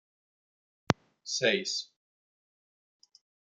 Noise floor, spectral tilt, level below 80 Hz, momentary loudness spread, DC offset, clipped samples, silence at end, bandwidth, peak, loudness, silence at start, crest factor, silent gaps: under -90 dBFS; -3 dB/octave; -70 dBFS; 8 LU; under 0.1%; under 0.1%; 1.7 s; 11 kHz; -4 dBFS; -30 LUFS; 0.9 s; 34 dB; none